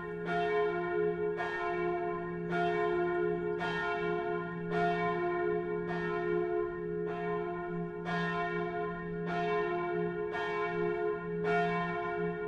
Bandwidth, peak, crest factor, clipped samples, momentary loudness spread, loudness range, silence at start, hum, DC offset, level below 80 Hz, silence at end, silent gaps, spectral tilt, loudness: 7.6 kHz; -20 dBFS; 14 dB; under 0.1%; 5 LU; 2 LU; 0 s; none; under 0.1%; -60 dBFS; 0 s; none; -7.5 dB/octave; -34 LUFS